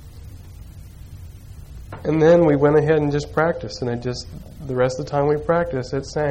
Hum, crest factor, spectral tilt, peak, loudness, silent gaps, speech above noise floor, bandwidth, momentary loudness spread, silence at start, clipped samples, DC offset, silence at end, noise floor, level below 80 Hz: none; 16 dB; -7 dB/octave; -6 dBFS; -20 LUFS; none; 20 dB; 10.5 kHz; 26 LU; 0 s; under 0.1%; under 0.1%; 0 s; -39 dBFS; -42 dBFS